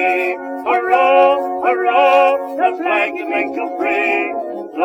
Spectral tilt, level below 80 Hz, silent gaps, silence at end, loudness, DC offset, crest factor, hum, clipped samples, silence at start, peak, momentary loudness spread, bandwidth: -4 dB/octave; -64 dBFS; none; 0 s; -15 LUFS; under 0.1%; 14 dB; none; under 0.1%; 0 s; 0 dBFS; 10 LU; 14.5 kHz